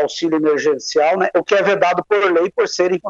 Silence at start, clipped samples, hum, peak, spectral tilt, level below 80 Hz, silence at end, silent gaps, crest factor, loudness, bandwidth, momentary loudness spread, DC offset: 0 s; under 0.1%; none; -2 dBFS; -4 dB/octave; -64 dBFS; 0 s; none; 14 dB; -16 LUFS; 7.8 kHz; 3 LU; under 0.1%